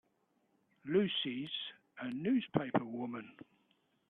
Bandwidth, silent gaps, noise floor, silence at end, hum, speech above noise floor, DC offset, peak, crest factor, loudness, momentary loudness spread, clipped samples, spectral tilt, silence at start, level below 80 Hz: 4.3 kHz; none; -77 dBFS; 0.65 s; none; 41 dB; under 0.1%; -16 dBFS; 24 dB; -37 LUFS; 14 LU; under 0.1%; -8.5 dB/octave; 0.85 s; -78 dBFS